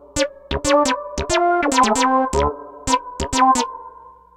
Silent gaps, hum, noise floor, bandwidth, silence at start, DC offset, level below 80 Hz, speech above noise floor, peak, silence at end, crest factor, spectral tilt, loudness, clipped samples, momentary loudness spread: none; none; -42 dBFS; 17 kHz; 0.15 s; under 0.1%; -36 dBFS; 26 dB; -2 dBFS; 0.25 s; 16 dB; -3.5 dB/octave; -18 LUFS; under 0.1%; 8 LU